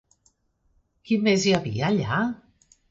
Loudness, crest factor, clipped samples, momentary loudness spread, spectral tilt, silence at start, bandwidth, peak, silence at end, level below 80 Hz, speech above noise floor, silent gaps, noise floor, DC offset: -23 LUFS; 18 dB; under 0.1%; 8 LU; -5.5 dB/octave; 1.05 s; 8 kHz; -8 dBFS; 0.55 s; -56 dBFS; 45 dB; none; -67 dBFS; under 0.1%